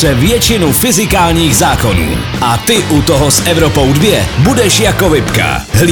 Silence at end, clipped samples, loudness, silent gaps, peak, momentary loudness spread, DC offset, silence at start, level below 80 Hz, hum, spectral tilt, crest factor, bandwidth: 0 s; 0.2%; -9 LUFS; none; 0 dBFS; 4 LU; under 0.1%; 0 s; -22 dBFS; none; -4 dB/octave; 10 dB; over 20 kHz